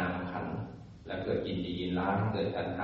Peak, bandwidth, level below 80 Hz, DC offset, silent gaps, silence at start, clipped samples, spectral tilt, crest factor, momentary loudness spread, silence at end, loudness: -16 dBFS; 5.8 kHz; -58 dBFS; under 0.1%; none; 0 s; under 0.1%; -5.5 dB/octave; 16 dB; 10 LU; 0 s; -34 LUFS